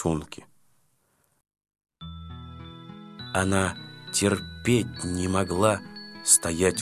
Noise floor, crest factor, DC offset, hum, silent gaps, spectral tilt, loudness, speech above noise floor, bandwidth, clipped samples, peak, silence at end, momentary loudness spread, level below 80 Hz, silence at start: -69 dBFS; 22 dB; under 0.1%; none; none; -4 dB/octave; -25 LUFS; 44 dB; 15.5 kHz; under 0.1%; -4 dBFS; 0 s; 24 LU; -46 dBFS; 0 s